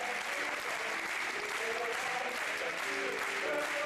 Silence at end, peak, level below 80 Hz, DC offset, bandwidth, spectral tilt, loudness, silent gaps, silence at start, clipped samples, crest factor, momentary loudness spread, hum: 0 s; -24 dBFS; -74 dBFS; under 0.1%; 15 kHz; -1 dB/octave; -34 LUFS; none; 0 s; under 0.1%; 12 dB; 1 LU; none